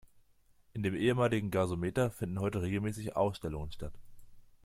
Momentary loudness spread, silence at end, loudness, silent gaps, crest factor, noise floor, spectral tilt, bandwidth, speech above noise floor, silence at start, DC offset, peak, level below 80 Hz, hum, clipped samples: 13 LU; 0.25 s; -34 LUFS; none; 18 dB; -66 dBFS; -7 dB/octave; 16.5 kHz; 33 dB; 0.75 s; under 0.1%; -16 dBFS; -54 dBFS; none; under 0.1%